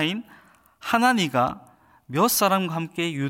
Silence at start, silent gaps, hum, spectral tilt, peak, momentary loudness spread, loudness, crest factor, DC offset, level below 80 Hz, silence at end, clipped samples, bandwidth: 0 s; none; none; -4 dB/octave; -6 dBFS; 13 LU; -22 LUFS; 18 dB; under 0.1%; -62 dBFS; 0 s; under 0.1%; 17 kHz